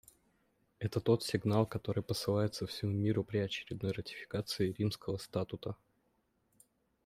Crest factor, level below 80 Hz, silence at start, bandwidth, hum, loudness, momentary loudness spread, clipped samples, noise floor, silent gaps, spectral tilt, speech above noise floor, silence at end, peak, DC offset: 20 dB; -66 dBFS; 0.8 s; 15.5 kHz; none; -36 LUFS; 9 LU; under 0.1%; -77 dBFS; none; -6 dB/octave; 42 dB; 1.3 s; -16 dBFS; under 0.1%